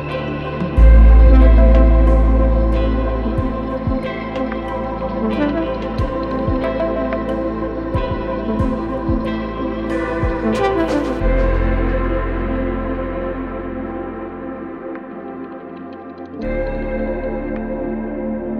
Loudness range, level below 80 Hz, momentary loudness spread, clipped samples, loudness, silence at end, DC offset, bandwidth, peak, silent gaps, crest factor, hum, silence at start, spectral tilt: 13 LU; -18 dBFS; 16 LU; under 0.1%; -18 LUFS; 0 s; under 0.1%; 5 kHz; 0 dBFS; none; 16 dB; none; 0 s; -9 dB/octave